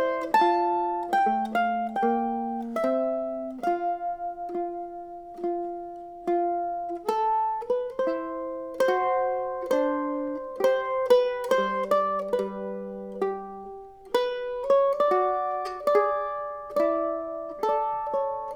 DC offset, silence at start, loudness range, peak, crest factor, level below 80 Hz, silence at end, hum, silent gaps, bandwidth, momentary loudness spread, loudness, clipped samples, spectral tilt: under 0.1%; 0 s; 5 LU; -8 dBFS; 18 dB; -62 dBFS; 0 s; none; none; 19.5 kHz; 12 LU; -27 LUFS; under 0.1%; -5.5 dB/octave